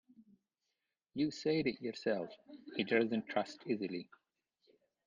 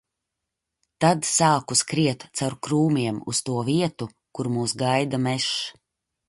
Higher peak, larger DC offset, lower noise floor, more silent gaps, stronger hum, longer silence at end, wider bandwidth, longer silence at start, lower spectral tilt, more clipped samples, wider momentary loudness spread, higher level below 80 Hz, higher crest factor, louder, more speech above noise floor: second, -20 dBFS vs -6 dBFS; neither; first, -88 dBFS vs -83 dBFS; neither; neither; first, 1.05 s vs 0.6 s; second, 7.6 kHz vs 11.5 kHz; second, 0.2 s vs 1 s; first, -6 dB/octave vs -4 dB/octave; neither; first, 15 LU vs 9 LU; second, -78 dBFS vs -62 dBFS; about the same, 20 dB vs 18 dB; second, -37 LUFS vs -23 LUFS; second, 51 dB vs 60 dB